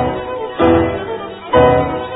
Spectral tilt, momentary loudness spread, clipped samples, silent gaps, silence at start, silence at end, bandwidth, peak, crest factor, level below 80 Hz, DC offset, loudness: -12 dB/octave; 13 LU; under 0.1%; none; 0 s; 0 s; 4 kHz; 0 dBFS; 14 dB; -34 dBFS; under 0.1%; -15 LUFS